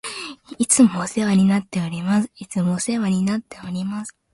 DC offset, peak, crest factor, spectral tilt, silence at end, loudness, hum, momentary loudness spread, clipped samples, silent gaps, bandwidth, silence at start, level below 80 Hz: under 0.1%; -4 dBFS; 18 dB; -5 dB/octave; 0.25 s; -20 LUFS; none; 15 LU; under 0.1%; none; 11.5 kHz; 0.05 s; -58 dBFS